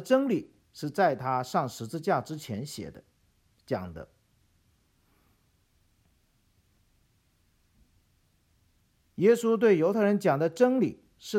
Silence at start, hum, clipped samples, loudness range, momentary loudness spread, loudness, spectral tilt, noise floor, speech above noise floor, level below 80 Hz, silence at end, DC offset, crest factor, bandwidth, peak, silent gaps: 0 s; none; under 0.1%; 17 LU; 19 LU; -27 LUFS; -6.5 dB/octave; -69 dBFS; 42 dB; -66 dBFS; 0 s; under 0.1%; 20 dB; 16 kHz; -10 dBFS; none